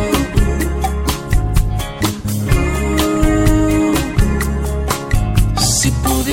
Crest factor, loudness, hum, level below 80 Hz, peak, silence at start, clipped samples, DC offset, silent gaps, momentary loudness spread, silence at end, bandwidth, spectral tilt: 12 dB; -16 LUFS; none; -18 dBFS; -2 dBFS; 0 s; under 0.1%; under 0.1%; none; 6 LU; 0 s; 17 kHz; -5 dB/octave